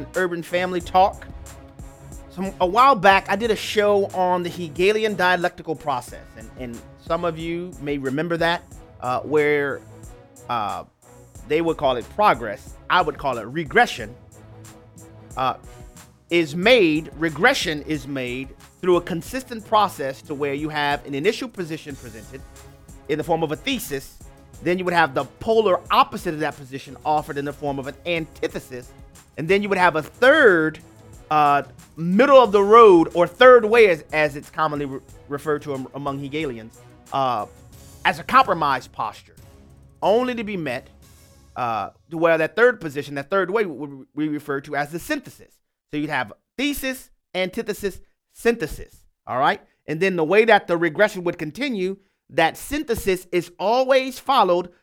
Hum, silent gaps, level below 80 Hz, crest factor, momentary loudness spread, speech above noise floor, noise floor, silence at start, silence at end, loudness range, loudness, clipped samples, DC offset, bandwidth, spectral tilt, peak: none; none; -48 dBFS; 20 dB; 17 LU; 29 dB; -50 dBFS; 0 s; 0.15 s; 11 LU; -20 LUFS; under 0.1%; under 0.1%; 17 kHz; -5 dB/octave; 0 dBFS